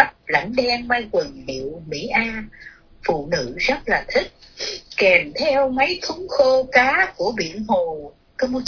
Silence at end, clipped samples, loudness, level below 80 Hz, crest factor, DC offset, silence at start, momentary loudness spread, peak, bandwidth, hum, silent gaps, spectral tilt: 0 s; under 0.1%; -20 LUFS; -46 dBFS; 20 dB; under 0.1%; 0 s; 14 LU; 0 dBFS; 5.4 kHz; none; none; -4 dB/octave